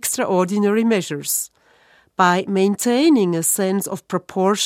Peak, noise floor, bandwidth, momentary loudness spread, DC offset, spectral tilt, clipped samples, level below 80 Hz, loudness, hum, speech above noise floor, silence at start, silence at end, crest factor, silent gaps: -2 dBFS; -54 dBFS; 16.5 kHz; 9 LU; under 0.1%; -4 dB/octave; under 0.1%; -68 dBFS; -18 LUFS; none; 36 dB; 0.05 s; 0 s; 18 dB; none